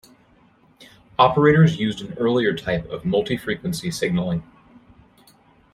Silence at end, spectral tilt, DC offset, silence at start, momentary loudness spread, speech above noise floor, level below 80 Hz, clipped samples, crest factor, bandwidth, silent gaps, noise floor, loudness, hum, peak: 1.3 s; -6.5 dB/octave; under 0.1%; 0.8 s; 11 LU; 36 dB; -50 dBFS; under 0.1%; 20 dB; 13.5 kHz; none; -56 dBFS; -21 LUFS; none; -2 dBFS